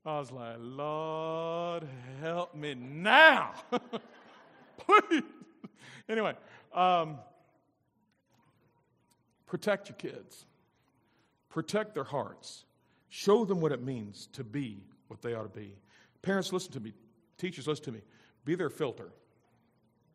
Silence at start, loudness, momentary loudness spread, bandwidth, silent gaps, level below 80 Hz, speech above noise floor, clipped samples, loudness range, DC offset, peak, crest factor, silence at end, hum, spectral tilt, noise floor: 0.05 s; -30 LUFS; 24 LU; 14.5 kHz; none; -80 dBFS; 43 dB; under 0.1%; 14 LU; under 0.1%; -6 dBFS; 28 dB; 1.05 s; none; -4.5 dB/octave; -75 dBFS